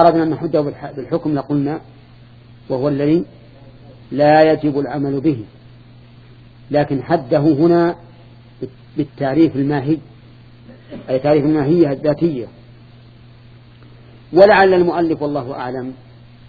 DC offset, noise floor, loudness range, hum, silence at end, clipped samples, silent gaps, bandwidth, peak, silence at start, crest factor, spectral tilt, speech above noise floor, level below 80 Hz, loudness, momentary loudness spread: under 0.1%; -43 dBFS; 4 LU; none; 0.55 s; under 0.1%; none; 4.9 kHz; 0 dBFS; 0 s; 18 dB; -9.5 dB/octave; 27 dB; -50 dBFS; -16 LUFS; 17 LU